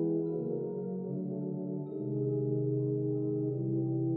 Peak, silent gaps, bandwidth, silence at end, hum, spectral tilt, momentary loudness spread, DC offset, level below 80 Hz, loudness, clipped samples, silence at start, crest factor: -22 dBFS; none; 1.5 kHz; 0 s; none; -16 dB/octave; 5 LU; under 0.1%; -78 dBFS; -34 LUFS; under 0.1%; 0 s; 12 dB